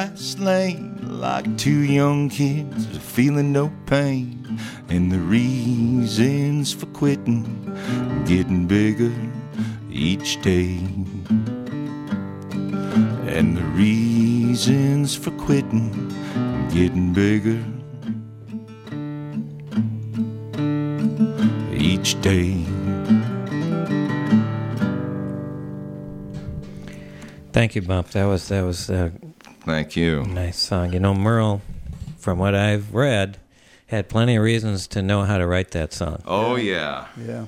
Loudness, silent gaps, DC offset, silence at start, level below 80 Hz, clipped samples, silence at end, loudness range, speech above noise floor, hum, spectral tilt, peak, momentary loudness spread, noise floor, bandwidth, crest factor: -22 LUFS; none; under 0.1%; 0 s; -44 dBFS; under 0.1%; 0 s; 5 LU; 31 dB; none; -6 dB/octave; -4 dBFS; 12 LU; -51 dBFS; 15 kHz; 18 dB